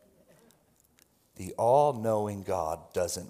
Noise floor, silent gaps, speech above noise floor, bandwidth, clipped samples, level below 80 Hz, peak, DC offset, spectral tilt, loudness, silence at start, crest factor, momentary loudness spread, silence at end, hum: -66 dBFS; none; 37 dB; 16 kHz; under 0.1%; -66 dBFS; -12 dBFS; under 0.1%; -5.5 dB/octave; -28 LUFS; 1.4 s; 20 dB; 12 LU; 0 s; none